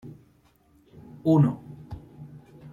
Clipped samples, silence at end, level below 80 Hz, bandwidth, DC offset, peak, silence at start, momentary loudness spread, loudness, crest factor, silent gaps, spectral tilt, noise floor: under 0.1%; 0.05 s; -58 dBFS; 7 kHz; under 0.1%; -10 dBFS; 0.05 s; 26 LU; -23 LUFS; 18 dB; none; -10.5 dB/octave; -61 dBFS